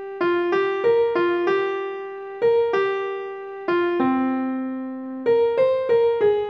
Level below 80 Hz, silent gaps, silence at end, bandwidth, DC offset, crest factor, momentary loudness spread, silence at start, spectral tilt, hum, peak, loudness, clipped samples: -64 dBFS; none; 0 s; 6 kHz; under 0.1%; 12 dB; 11 LU; 0 s; -7 dB/octave; none; -10 dBFS; -22 LUFS; under 0.1%